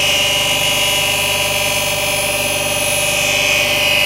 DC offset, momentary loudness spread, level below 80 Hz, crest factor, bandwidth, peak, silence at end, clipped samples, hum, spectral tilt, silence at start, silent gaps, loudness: under 0.1%; 3 LU; -40 dBFS; 14 dB; 16 kHz; -2 dBFS; 0 s; under 0.1%; 50 Hz at -35 dBFS; -1 dB/octave; 0 s; none; -13 LUFS